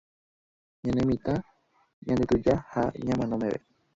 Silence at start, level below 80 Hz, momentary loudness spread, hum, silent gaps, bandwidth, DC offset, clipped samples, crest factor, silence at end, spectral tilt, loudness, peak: 0.85 s; -50 dBFS; 9 LU; none; 1.93-2.02 s; 7.8 kHz; under 0.1%; under 0.1%; 18 dB; 0.4 s; -8 dB/octave; -28 LUFS; -10 dBFS